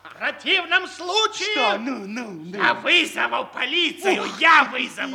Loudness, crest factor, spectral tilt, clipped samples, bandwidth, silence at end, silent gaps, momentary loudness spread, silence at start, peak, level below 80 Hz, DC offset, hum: -20 LUFS; 20 dB; -2 dB/octave; under 0.1%; 17.5 kHz; 0 s; none; 13 LU; 0.05 s; -2 dBFS; -74 dBFS; under 0.1%; none